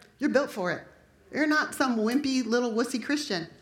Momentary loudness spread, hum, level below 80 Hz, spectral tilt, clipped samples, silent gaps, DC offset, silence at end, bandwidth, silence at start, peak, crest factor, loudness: 7 LU; none; -68 dBFS; -4 dB/octave; under 0.1%; none; under 0.1%; 0.15 s; 17 kHz; 0.2 s; -10 dBFS; 18 dB; -28 LUFS